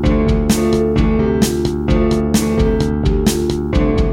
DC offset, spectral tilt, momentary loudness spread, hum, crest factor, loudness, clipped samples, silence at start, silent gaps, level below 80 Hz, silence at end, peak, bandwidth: 0.3%; -6 dB/octave; 2 LU; none; 14 dB; -15 LUFS; under 0.1%; 0 s; none; -20 dBFS; 0 s; 0 dBFS; 16.5 kHz